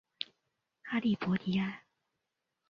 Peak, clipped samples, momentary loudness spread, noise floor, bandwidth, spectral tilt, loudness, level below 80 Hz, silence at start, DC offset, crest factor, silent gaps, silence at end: -14 dBFS; under 0.1%; 15 LU; -86 dBFS; 6.6 kHz; -7.5 dB/octave; -34 LUFS; -72 dBFS; 0.2 s; under 0.1%; 22 dB; none; 0.9 s